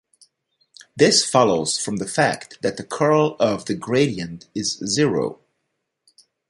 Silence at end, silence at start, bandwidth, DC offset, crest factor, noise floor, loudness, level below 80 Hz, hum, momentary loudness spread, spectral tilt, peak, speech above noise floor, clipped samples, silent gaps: 1.15 s; 0.95 s; 11.5 kHz; under 0.1%; 20 dB; -76 dBFS; -20 LUFS; -58 dBFS; none; 11 LU; -4 dB/octave; -2 dBFS; 56 dB; under 0.1%; none